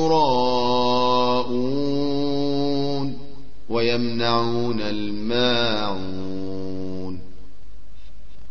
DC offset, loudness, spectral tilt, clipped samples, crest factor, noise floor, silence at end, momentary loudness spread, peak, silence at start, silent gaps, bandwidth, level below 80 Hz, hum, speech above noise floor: 6%; -23 LUFS; -6 dB/octave; under 0.1%; 16 dB; -46 dBFS; 0 s; 12 LU; -6 dBFS; 0 s; none; 6.8 kHz; -48 dBFS; none; 24 dB